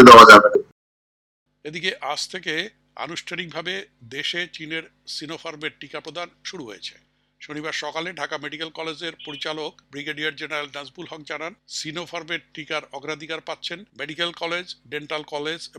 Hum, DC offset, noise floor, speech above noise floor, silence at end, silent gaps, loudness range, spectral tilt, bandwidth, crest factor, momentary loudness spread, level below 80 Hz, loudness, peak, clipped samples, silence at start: none; under 0.1%; under -90 dBFS; over 71 dB; 0.1 s; 0.72-1.46 s; 3 LU; -3.5 dB/octave; 15.5 kHz; 20 dB; 9 LU; -56 dBFS; -18 LUFS; 0 dBFS; 0.1%; 0 s